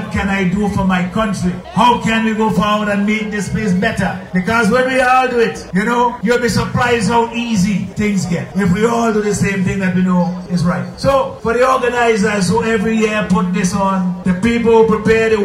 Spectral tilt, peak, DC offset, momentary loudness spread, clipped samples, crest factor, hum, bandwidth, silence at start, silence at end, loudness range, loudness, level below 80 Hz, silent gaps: -6 dB/octave; 0 dBFS; under 0.1%; 6 LU; under 0.1%; 14 dB; none; 15 kHz; 0 s; 0 s; 2 LU; -15 LUFS; -36 dBFS; none